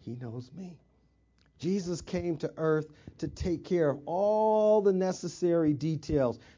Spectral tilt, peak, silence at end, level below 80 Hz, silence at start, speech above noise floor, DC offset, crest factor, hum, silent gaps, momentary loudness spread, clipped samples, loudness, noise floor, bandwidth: -7 dB/octave; -14 dBFS; 0.2 s; -52 dBFS; 0.05 s; 38 dB; under 0.1%; 16 dB; none; none; 16 LU; under 0.1%; -29 LUFS; -67 dBFS; 7.6 kHz